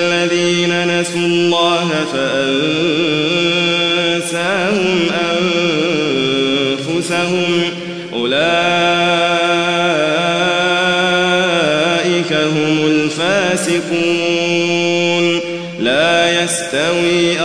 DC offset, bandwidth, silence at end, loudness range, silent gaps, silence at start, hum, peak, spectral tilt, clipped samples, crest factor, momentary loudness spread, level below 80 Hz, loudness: 0.3%; 11 kHz; 0 s; 2 LU; none; 0 s; none; 0 dBFS; -4 dB/octave; under 0.1%; 14 dB; 4 LU; -58 dBFS; -14 LUFS